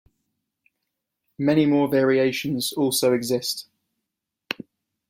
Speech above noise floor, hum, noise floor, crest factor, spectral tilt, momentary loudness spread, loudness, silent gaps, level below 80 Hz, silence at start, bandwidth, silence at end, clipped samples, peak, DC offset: 62 dB; none; -83 dBFS; 20 dB; -4.5 dB/octave; 14 LU; -22 LUFS; none; -66 dBFS; 1.4 s; 16.5 kHz; 0.55 s; under 0.1%; -6 dBFS; under 0.1%